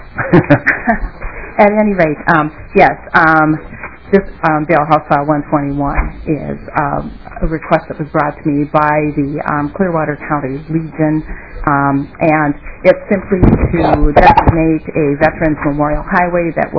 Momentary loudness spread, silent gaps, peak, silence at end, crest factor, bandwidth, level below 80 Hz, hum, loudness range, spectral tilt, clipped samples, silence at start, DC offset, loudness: 10 LU; none; 0 dBFS; 0 s; 12 dB; 5.4 kHz; -24 dBFS; none; 5 LU; -9.5 dB/octave; 0.9%; 0 s; 1%; -13 LUFS